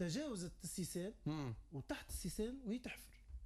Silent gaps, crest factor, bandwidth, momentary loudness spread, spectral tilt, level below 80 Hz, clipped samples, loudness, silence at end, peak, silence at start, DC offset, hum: none; 14 dB; 14 kHz; 7 LU; -5 dB/octave; -58 dBFS; under 0.1%; -46 LUFS; 0 s; -32 dBFS; 0 s; under 0.1%; none